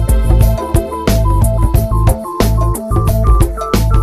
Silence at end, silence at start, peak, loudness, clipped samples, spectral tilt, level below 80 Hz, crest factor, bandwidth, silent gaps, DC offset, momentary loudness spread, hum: 0 s; 0 s; 0 dBFS; -14 LUFS; under 0.1%; -6.5 dB/octave; -14 dBFS; 12 dB; 15 kHz; none; under 0.1%; 3 LU; none